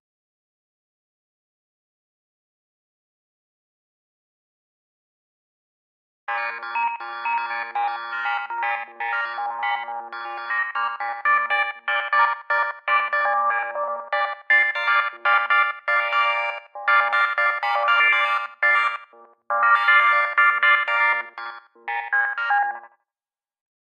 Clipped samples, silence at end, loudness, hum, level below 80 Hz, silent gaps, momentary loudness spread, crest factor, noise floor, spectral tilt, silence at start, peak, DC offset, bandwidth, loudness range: under 0.1%; 1.15 s; -21 LUFS; none; under -90 dBFS; none; 11 LU; 20 dB; under -90 dBFS; 1 dB/octave; 6.3 s; -4 dBFS; under 0.1%; 8.6 kHz; 10 LU